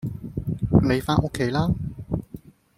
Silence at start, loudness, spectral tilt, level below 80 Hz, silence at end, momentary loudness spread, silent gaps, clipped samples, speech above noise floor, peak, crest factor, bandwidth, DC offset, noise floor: 0 s; -24 LUFS; -7.5 dB/octave; -40 dBFS; 0.4 s; 12 LU; none; under 0.1%; 21 dB; -4 dBFS; 20 dB; 15.5 kHz; under 0.1%; -44 dBFS